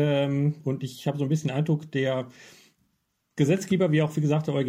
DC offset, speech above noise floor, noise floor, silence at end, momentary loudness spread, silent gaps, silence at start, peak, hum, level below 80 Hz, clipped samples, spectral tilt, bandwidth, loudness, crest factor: under 0.1%; 50 dB; -75 dBFS; 0 s; 8 LU; none; 0 s; -10 dBFS; none; -68 dBFS; under 0.1%; -7 dB/octave; 14 kHz; -26 LUFS; 16 dB